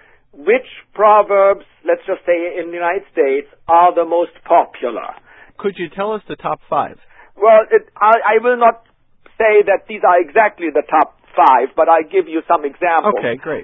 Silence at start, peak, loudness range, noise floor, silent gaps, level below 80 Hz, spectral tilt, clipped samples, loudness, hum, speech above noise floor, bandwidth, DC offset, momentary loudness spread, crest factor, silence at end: 0.4 s; 0 dBFS; 4 LU; -45 dBFS; none; -58 dBFS; -7.5 dB/octave; under 0.1%; -15 LUFS; none; 31 dB; 4 kHz; under 0.1%; 12 LU; 14 dB; 0 s